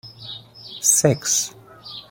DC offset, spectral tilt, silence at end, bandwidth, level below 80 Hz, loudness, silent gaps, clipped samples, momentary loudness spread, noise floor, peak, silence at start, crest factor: under 0.1%; -3 dB/octave; 0.1 s; 16.5 kHz; -58 dBFS; -18 LUFS; none; under 0.1%; 21 LU; -40 dBFS; -2 dBFS; 0.05 s; 22 dB